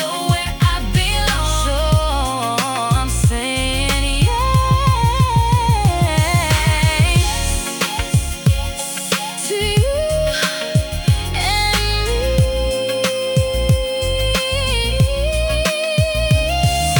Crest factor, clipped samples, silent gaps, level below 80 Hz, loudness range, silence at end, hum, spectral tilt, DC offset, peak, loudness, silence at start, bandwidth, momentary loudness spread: 14 dB; under 0.1%; none; -22 dBFS; 3 LU; 0 s; none; -4.5 dB/octave; under 0.1%; -2 dBFS; -17 LUFS; 0 s; 19 kHz; 4 LU